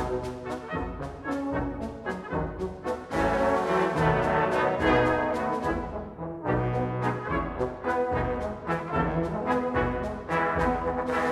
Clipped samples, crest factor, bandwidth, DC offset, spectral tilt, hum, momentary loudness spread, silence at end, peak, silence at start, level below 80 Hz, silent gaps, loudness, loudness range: under 0.1%; 18 dB; 13 kHz; under 0.1%; -7 dB/octave; none; 10 LU; 0 s; -10 dBFS; 0 s; -42 dBFS; none; -28 LUFS; 4 LU